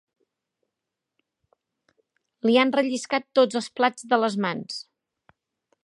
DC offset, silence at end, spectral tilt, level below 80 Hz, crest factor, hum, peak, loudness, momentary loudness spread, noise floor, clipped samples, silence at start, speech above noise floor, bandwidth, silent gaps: under 0.1%; 1.05 s; -4 dB/octave; -78 dBFS; 20 dB; none; -6 dBFS; -23 LUFS; 10 LU; -85 dBFS; under 0.1%; 2.45 s; 62 dB; 11.5 kHz; none